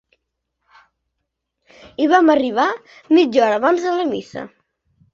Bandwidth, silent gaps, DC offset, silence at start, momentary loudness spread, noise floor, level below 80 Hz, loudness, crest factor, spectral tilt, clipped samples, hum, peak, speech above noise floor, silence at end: 7.4 kHz; none; under 0.1%; 2 s; 19 LU; -77 dBFS; -64 dBFS; -16 LUFS; 18 dB; -4.5 dB/octave; under 0.1%; none; -2 dBFS; 60 dB; 0.65 s